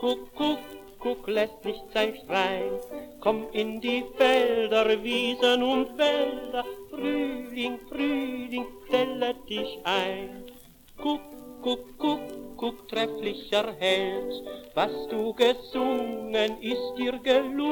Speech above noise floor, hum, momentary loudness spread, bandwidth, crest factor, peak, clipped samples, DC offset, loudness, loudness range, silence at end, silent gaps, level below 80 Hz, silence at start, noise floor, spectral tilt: 22 dB; none; 11 LU; 18 kHz; 20 dB; -8 dBFS; under 0.1%; under 0.1%; -28 LUFS; 6 LU; 0 s; none; -56 dBFS; 0 s; -49 dBFS; -4 dB/octave